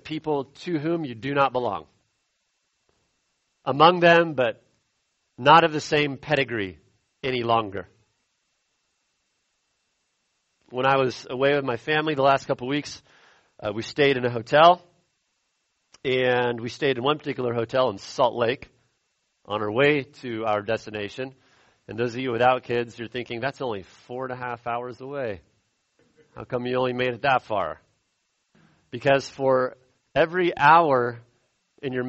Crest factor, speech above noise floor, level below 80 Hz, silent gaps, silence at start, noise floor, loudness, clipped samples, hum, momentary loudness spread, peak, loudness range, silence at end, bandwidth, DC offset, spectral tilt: 24 dB; 51 dB; -62 dBFS; none; 0.05 s; -74 dBFS; -23 LUFS; under 0.1%; none; 17 LU; -2 dBFS; 9 LU; 0 s; 8.2 kHz; under 0.1%; -5.5 dB/octave